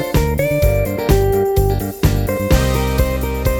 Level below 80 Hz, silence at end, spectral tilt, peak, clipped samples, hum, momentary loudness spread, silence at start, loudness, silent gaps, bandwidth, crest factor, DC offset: -20 dBFS; 0 s; -6 dB/octave; 0 dBFS; under 0.1%; none; 4 LU; 0 s; -17 LUFS; none; 19.5 kHz; 14 dB; under 0.1%